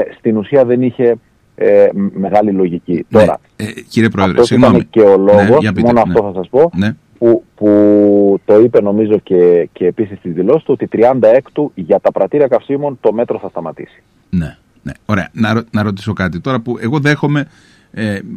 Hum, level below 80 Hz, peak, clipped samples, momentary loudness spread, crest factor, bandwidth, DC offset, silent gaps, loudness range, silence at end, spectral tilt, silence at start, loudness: none; -44 dBFS; 0 dBFS; under 0.1%; 12 LU; 12 dB; 11.5 kHz; under 0.1%; none; 8 LU; 0 s; -8 dB/octave; 0 s; -12 LUFS